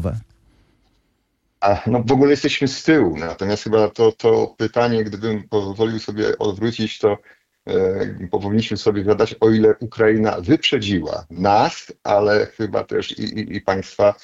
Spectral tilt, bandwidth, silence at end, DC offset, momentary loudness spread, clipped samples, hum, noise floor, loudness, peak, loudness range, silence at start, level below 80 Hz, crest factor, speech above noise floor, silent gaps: -6 dB/octave; 7.8 kHz; 0.1 s; under 0.1%; 9 LU; under 0.1%; none; -68 dBFS; -19 LUFS; -4 dBFS; 4 LU; 0 s; -50 dBFS; 14 dB; 50 dB; none